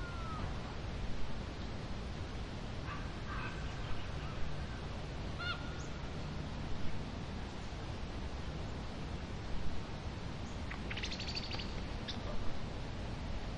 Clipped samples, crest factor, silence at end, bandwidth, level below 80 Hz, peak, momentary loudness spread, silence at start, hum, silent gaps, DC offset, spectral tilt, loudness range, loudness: under 0.1%; 16 dB; 0 s; 10.5 kHz; -46 dBFS; -22 dBFS; 4 LU; 0 s; none; none; 0.1%; -5.5 dB/octave; 2 LU; -43 LUFS